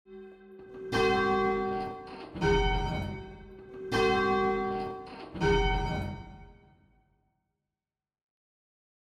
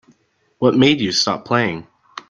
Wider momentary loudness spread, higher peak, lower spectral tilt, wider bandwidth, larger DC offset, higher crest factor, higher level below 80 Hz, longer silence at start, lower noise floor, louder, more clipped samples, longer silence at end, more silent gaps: first, 22 LU vs 14 LU; second, -14 dBFS vs -2 dBFS; first, -6 dB/octave vs -4.5 dB/octave; first, 12 kHz vs 9.6 kHz; neither; about the same, 18 dB vs 18 dB; first, -42 dBFS vs -54 dBFS; second, 0.1 s vs 0.6 s; first, under -90 dBFS vs -59 dBFS; second, -29 LUFS vs -17 LUFS; neither; first, 2.55 s vs 0.1 s; neither